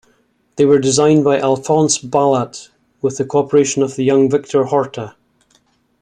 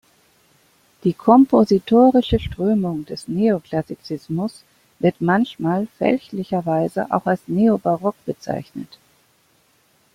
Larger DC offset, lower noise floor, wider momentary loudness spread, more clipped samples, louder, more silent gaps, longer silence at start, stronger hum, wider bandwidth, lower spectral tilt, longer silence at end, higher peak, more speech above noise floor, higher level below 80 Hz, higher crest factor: neither; about the same, -59 dBFS vs -60 dBFS; about the same, 13 LU vs 15 LU; neither; first, -15 LUFS vs -19 LUFS; neither; second, 0.55 s vs 1.05 s; neither; second, 10.5 kHz vs 14 kHz; second, -5 dB/octave vs -8 dB/octave; second, 0.9 s vs 1.3 s; about the same, -2 dBFS vs -2 dBFS; first, 45 dB vs 41 dB; second, -56 dBFS vs -44 dBFS; about the same, 14 dB vs 18 dB